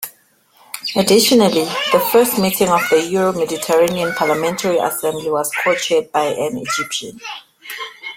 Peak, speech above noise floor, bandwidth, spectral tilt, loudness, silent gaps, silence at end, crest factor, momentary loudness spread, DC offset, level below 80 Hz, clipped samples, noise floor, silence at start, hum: 0 dBFS; 38 dB; 16.5 kHz; -3.5 dB/octave; -16 LUFS; none; 0 s; 16 dB; 16 LU; under 0.1%; -56 dBFS; under 0.1%; -54 dBFS; 0 s; none